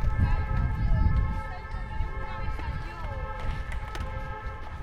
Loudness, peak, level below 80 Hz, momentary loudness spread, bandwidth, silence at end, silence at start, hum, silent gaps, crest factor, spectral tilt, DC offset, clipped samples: -32 LUFS; -12 dBFS; -30 dBFS; 10 LU; 8.8 kHz; 0 s; 0 s; none; none; 16 dB; -7.5 dB/octave; under 0.1%; under 0.1%